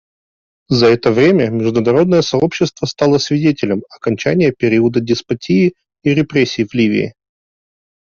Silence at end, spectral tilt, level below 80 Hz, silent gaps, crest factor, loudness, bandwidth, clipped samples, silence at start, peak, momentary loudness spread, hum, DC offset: 1 s; -6.5 dB/octave; -50 dBFS; none; 12 dB; -14 LUFS; 7.2 kHz; under 0.1%; 0.7 s; -2 dBFS; 7 LU; none; under 0.1%